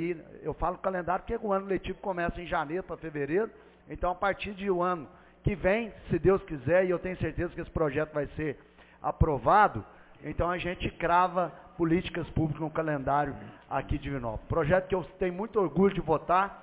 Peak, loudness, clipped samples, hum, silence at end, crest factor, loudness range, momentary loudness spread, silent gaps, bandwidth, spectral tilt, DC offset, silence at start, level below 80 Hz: -10 dBFS; -30 LUFS; under 0.1%; none; 0 s; 20 dB; 4 LU; 10 LU; none; 4 kHz; -6 dB/octave; under 0.1%; 0 s; -44 dBFS